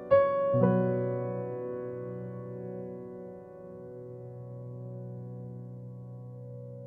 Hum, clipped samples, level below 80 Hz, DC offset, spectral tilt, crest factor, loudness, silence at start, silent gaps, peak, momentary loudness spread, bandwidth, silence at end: none; under 0.1%; -66 dBFS; under 0.1%; -11.5 dB/octave; 22 dB; -32 LUFS; 0 s; none; -10 dBFS; 19 LU; 4.8 kHz; 0 s